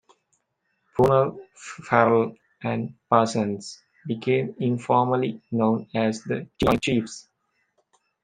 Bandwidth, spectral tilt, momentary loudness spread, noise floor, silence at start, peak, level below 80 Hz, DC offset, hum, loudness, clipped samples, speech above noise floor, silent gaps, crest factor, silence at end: 15 kHz; -6.5 dB/octave; 16 LU; -74 dBFS; 0.95 s; -2 dBFS; -54 dBFS; under 0.1%; none; -24 LUFS; under 0.1%; 51 dB; none; 24 dB; 1 s